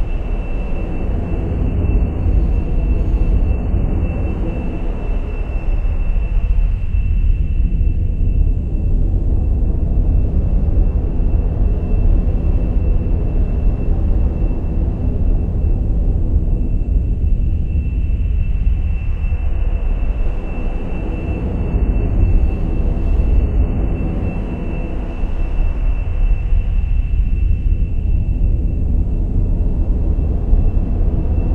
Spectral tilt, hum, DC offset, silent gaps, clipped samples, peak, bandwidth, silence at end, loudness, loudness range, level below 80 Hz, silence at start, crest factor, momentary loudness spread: -10.5 dB/octave; none; under 0.1%; none; under 0.1%; 0 dBFS; 3.2 kHz; 0 s; -20 LUFS; 3 LU; -16 dBFS; 0 s; 14 dB; 6 LU